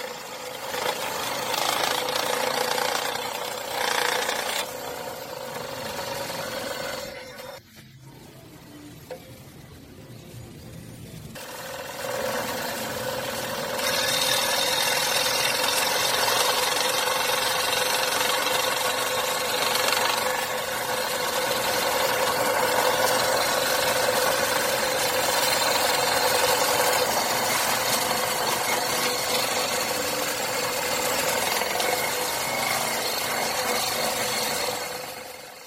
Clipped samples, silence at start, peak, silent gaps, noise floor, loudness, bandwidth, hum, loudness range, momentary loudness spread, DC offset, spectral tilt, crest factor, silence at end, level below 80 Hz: under 0.1%; 0 s; -6 dBFS; none; -47 dBFS; -24 LUFS; 16.5 kHz; none; 13 LU; 14 LU; under 0.1%; -1 dB/octave; 20 dB; 0 s; -58 dBFS